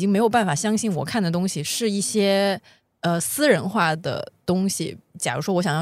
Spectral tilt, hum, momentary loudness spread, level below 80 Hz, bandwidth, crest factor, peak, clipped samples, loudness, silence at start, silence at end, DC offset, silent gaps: -4.5 dB/octave; none; 9 LU; -64 dBFS; 15.5 kHz; 18 dB; -4 dBFS; under 0.1%; -22 LUFS; 0 s; 0 s; under 0.1%; none